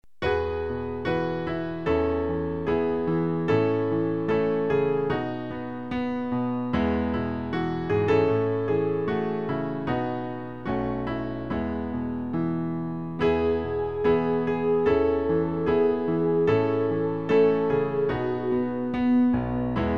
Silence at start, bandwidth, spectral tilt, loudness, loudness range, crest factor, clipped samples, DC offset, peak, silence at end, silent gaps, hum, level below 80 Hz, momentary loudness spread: 0.2 s; 6.2 kHz; -9 dB/octave; -26 LUFS; 5 LU; 14 dB; under 0.1%; 0.5%; -10 dBFS; 0 s; none; none; -46 dBFS; 8 LU